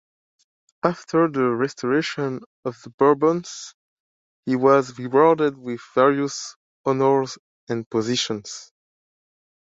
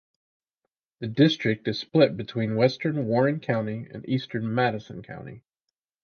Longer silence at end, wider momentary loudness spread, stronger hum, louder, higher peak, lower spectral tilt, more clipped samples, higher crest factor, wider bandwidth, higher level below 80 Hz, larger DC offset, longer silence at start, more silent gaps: first, 1.1 s vs 0.65 s; about the same, 16 LU vs 16 LU; neither; first, -21 LUFS vs -25 LUFS; first, -2 dBFS vs -6 dBFS; second, -5 dB/octave vs -7.5 dB/octave; neither; about the same, 20 dB vs 20 dB; first, 7.8 kHz vs 6.8 kHz; about the same, -68 dBFS vs -64 dBFS; neither; second, 0.85 s vs 1 s; first, 2.46-2.63 s, 2.94-2.98 s, 3.74-4.43 s, 6.56-6.84 s, 7.39-7.67 s, 7.86-7.91 s vs none